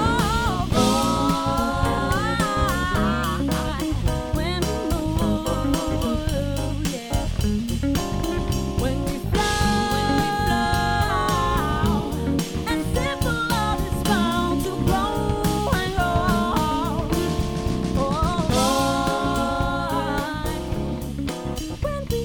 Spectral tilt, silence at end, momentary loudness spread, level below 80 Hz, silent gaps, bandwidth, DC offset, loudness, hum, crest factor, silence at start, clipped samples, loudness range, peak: -5.5 dB/octave; 0 s; 5 LU; -30 dBFS; none; 19 kHz; under 0.1%; -23 LUFS; none; 16 dB; 0 s; under 0.1%; 3 LU; -6 dBFS